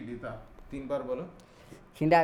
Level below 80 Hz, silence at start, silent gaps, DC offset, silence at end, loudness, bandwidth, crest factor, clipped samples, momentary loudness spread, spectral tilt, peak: -54 dBFS; 0 s; none; under 0.1%; 0 s; -34 LUFS; 15.5 kHz; 20 dB; under 0.1%; 21 LU; -7.5 dB/octave; -12 dBFS